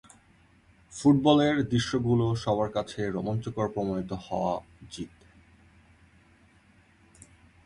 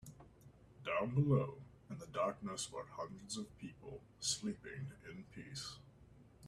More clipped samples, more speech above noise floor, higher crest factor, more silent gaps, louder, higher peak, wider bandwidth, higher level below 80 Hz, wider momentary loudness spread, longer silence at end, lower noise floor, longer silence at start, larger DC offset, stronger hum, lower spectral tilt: neither; first, 34 dB vs 21 dB; about the same, 20 dB vs 20 dB; neither; first, -27 LUFS vs -42 LUFS; first, -8 dBFS vs -22 dBFS; second, 11 kHz vs 13 kHz; first, -54 dBFS vs -68 dBFS; about the same, 19 LU vs 19 LU; first, 2.6 s vs 0 s; about the same, -60 dBFS vs -63 dBFS; first, 0.9 s vs 0 s; neither; neither; first, -6.5 dB/octave vs -5 dB/octave